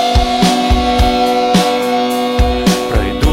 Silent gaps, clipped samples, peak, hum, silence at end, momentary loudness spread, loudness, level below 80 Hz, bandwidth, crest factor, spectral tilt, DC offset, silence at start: none; under 0.1%; -2 dBFS; none; 0 s; 3 LU; -13 LUFS; -18 dBFS; 16.5 kHz; 10 dB; -5 dB/octave; under 0.1%; 0 s